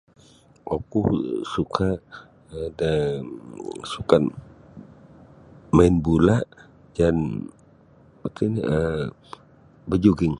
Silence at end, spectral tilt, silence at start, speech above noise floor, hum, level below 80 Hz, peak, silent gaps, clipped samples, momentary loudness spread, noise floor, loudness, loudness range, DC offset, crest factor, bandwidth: 0 s; -7.5 dB/octave; 0.65 s; 32 dB; none; -40 dBFS; 0 dBFS; none; under 0.1%; 22 LU; -54 dBFS; -23 LUFS; 4 LU; under 0.1%; 24 dB; 11 kHz